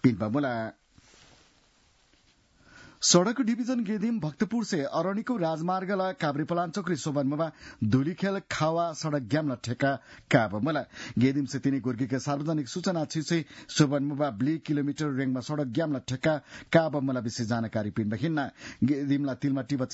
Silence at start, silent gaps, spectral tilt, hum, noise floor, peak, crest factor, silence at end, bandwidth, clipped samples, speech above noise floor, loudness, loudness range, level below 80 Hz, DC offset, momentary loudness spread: 0.05 s; none; -5 dB/octave; none; -64 dBFS; -6 dBFS; 22 dB; 0 s; 8 kHz; under 0.1%; 36 dB; -29 LUFS; 2 LU; -64 dBFS; under 0.1%; 6 LU